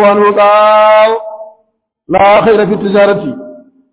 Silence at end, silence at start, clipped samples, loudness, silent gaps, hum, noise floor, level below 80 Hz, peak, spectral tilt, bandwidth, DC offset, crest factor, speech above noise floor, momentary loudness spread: 0.35 s; 0 s; under 0.1%; -8 LUFS; none; none; -59 dBFS; -46 dBFS; 0 dBFS; -9 dB/octave; 4 kHz; under 0.1%; 8 dB; 52 dB; 13 LU